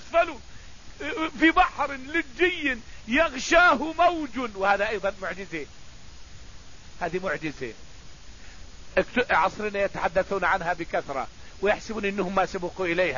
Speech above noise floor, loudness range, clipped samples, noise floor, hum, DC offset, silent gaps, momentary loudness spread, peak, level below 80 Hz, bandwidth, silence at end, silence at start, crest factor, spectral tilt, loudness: 21 dB; 11 LU; under 0.1%; -46 dBFS; none; 0.7%; none; 13 LU; -6 dBFS; -46 dBFS; 7.4 kHz; 0 s; 0 s; 20 dB; -4 dB/octave; -25 LUFS